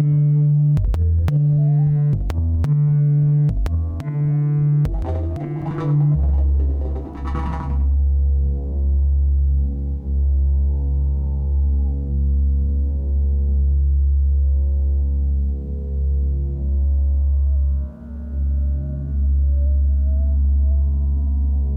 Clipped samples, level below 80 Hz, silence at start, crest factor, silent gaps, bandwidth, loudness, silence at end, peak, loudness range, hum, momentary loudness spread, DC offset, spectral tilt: under 0.1%; -20 dBFS; 0 s; 8 dB; none; 2.4 kHz; -20 LUFS; 0 s; -10 dBFS; 3 LU; none; 8 LU; under 0.1%; -11 dB/octave